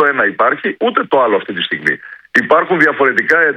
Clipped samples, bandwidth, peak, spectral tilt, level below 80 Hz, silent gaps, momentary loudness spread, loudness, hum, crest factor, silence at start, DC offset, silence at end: 0.2%; 10.5 kHz; 0 dBFS; -5 dB/octave; -60 dBFS; none; 6 LU; -13 LUFS; none; 14 dB; 0 s; under 0.1%; 0 s